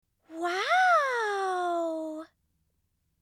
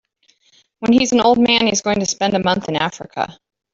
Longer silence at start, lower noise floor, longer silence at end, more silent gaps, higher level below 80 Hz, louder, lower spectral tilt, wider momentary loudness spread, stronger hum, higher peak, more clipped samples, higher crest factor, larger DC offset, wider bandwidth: second, 0.3 s vs 0.8 s; first, -75 dBFS vs -59 dBFS; first, 0.95 s vs 0.4 s; neither; second, -80 dBFS vs -52 dBFS; second, -27 LUFS vs -17 LUFS; second, -1 dB/octave vs -3.5 dB/octave; first, 16 LU vs 12 LU; neither; second, -14 dBFS vs -2 dBFS; neither; about the same, 16 dB vs 16 dB; neither; first, 14 kHz vs 7.8 kHz